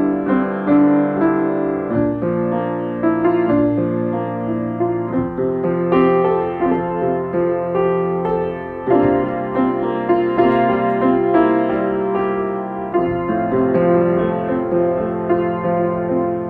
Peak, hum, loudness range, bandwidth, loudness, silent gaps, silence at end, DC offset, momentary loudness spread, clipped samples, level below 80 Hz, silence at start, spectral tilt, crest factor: -2 dBFS; none; 2 LU; 4.3 kHz; -18 LUFS; none; 0 s; under 0.1%; 6 LU; under 0.1%; -46 dBFS; 0 s; -10.5 dB/octave; 16 dB